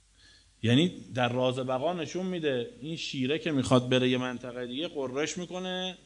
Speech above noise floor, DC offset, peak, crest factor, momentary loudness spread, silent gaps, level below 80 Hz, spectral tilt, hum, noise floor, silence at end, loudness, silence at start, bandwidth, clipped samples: 30 dB; under 0.1%; -10 dBFS; 20 dB; 10 LU; none; -64 dBFS; -5.5 dB/octave; none; -59 dBFS; 0.1 s; -30 LUFS; 0.65 s; 11 kHz; under 0.1%